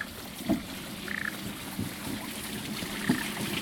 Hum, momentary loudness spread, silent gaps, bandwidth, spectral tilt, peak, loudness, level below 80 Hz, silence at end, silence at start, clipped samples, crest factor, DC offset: none; 7 LU; none; over 20 kHz; -3.5 dB/octave; -12 dBFS; -34 LUFS; -54 dBFS; 0 s; 0 s; under 0.1%; 22 dB; under 0.1%